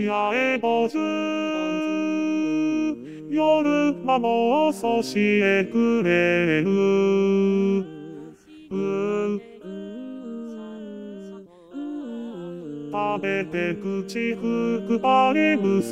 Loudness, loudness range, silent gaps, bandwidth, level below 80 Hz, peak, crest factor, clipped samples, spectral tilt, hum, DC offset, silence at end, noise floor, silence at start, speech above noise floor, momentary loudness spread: -22 LUFS; 11 LU; none; 13.5 kHz; -70 dBFS; -6 dBFS; 18 dB; under 0.1%; -6.5 dB/octave; none; 0.1%; 0 s; -44 dBFS; 0 s; 22 dB; 16 LU